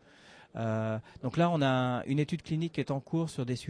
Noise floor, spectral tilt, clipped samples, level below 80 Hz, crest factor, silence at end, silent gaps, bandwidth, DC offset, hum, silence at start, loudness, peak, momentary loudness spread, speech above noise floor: -57 dBFS; -7 dB/octave; under 0.1%; -64 dBFS; 16 dB; 0 s; none; 11 kHz; under 0.1%; none; 0.25 s; -32 LUFS; -16 dBFS; 8 LU; 26 dB